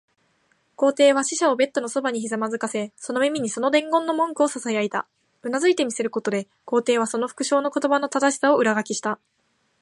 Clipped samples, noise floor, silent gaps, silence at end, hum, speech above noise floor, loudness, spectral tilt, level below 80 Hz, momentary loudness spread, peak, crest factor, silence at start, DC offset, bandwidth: under 0.1%; -66 dBFS; none; 0.65 s; none; 44 dB; -22 LUFS; -3 dB/octave; -76 dBFS; 9 LU; -6 dBFS; 18 dB; 0.8 s; under 0.1%; 11.5 kHz